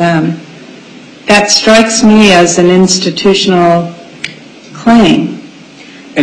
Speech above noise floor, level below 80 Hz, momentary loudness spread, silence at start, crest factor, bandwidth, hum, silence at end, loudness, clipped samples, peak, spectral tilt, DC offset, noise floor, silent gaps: 26 dB; -40 dBFS; 18 LU; 0 s; 8 dB; 11.5 kHz; none; 0 s; -7 LUFS; 0.2%; 0 dBFS; -4 dB/octave; under 0.1%; -33 dBFS; none